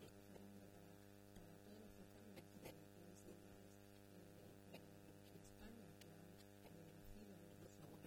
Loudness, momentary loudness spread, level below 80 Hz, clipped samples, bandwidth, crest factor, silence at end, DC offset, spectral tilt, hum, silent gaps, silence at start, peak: -63 LUFS; 3 LU; -74 dBFS; under 0.1%; 18 kHz; 18 dB; 0 s; under 0.1%; -5.5 dB/octave; 50 Hz at -70 dBFS; none; 0 s; -44 dBFS